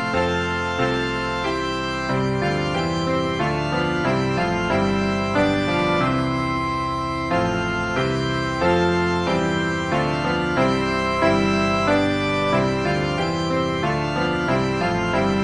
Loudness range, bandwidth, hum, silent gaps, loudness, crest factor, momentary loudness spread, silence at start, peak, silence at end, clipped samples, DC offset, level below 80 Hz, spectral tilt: 2 LU; 10.5 kHz; none; none; -21 LUFS; 16 dB; 4 LU; 0 s; -4 dBFS; 0 s; under 0.1%; 0.3%; -40 dBFS; -6 dB/octave